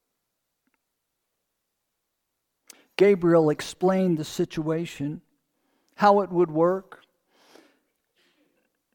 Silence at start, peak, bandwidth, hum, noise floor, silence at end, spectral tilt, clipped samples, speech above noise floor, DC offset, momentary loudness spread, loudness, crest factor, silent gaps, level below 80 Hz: 3 s; -6 dBFS; 18 kHz; none; -80 dBFS; 2.15 s; -6.5 dB/octave; under 0.1%; 58 dB; under 0.1%; 13 LU; -23 LUFS; 20 dB; none; -64 dBFS